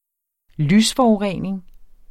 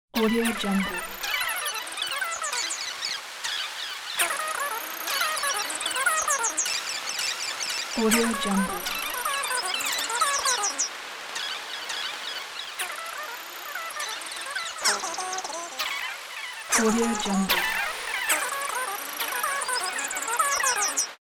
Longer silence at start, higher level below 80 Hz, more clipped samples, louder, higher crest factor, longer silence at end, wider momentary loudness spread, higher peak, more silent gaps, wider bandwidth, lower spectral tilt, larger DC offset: first, 0.6 s vs 0.15 s; first, -46 dBFS vs -56 dBFS; neither; first, -18 LUFS vs -26 LUFS; second, 14 dB vs 20 dB; first, 0.25 s vs 0.05 s; first, 13 LU vs 9 LU; about the same, -6 dBFS vs -8 dBFS; neither; second, 15 kHz vs 18 kHz; first, -5 dB/octave vs -1.5 dB/octave; neither